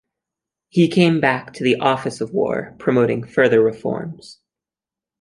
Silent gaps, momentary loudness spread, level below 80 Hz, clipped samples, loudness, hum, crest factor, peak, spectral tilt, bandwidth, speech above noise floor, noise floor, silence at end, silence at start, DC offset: none; 11 LU; -58 dBFS; under 0.1%; -18 LUFS; none; 18 dB; -2 dBFS; -6.5 dB/octave; 11.5 kHz; 71 dB; -89 dBFS; 0.9 s; 0.75 s; under 0.1%